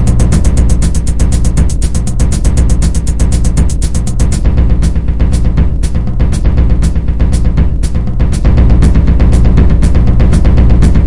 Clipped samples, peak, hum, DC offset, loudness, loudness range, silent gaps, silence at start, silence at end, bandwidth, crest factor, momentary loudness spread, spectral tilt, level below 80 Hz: 0.3%; 0 dBFS; none; 10%; -11 LUFS; 3 LU; none; 0 s; 0 s; 11.5 kHz; 8 dB; 5 LU; -7 dB/octave; -10 dBFS